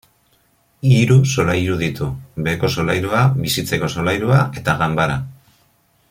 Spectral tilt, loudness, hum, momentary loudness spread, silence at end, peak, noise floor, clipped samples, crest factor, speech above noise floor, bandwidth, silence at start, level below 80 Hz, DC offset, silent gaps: -6 dB/octave; -17 LUFS; none; 9 LU; 0.8 s; -2 dBFS; -59 dBFS; under 0.1%; 16 dB; 42 dB; 16 kHz; 0.85 s; -44 dBFS; under 0.1%; none